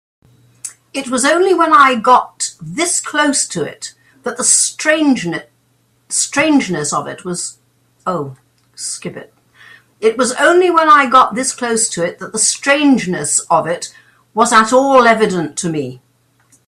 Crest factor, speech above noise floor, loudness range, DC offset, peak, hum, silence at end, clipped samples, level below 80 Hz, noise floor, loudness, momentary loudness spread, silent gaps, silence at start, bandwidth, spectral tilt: 14 dB; 44 dB; 6 LU; under 0.1%; 0 dBFS; none; 0.7 s; under 0.1%; -58 dBFS; -58 dBFS; -13 LUFS; 17 LU; none; 0.65 s; 16 kHz; -2.5 dB/octave